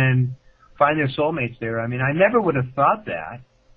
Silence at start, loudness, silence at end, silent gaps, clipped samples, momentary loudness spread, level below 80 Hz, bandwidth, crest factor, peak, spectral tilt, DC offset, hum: 0 s; -21 LUFS; 0.35 s; none; under 0.1%; 13 LU; -54 dBFS; 4.6 kHz; 18 dB; -2 dBFS; -10 dB/octave; under 0.1%; none